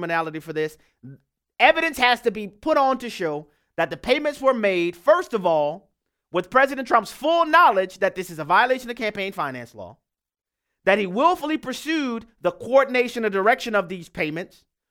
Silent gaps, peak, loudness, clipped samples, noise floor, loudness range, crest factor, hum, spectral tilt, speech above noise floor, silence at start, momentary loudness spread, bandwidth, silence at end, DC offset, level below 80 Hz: none; 0 dBFS; -21 LUFS; under 0.1%; -88 dBFS; 5 LU; 22 dB; none; -4.5 dB/octave; 66 dB; 0 s; 11 LU; 17.5 kHz; 0.45 s; under 0.1%; -58 dBFS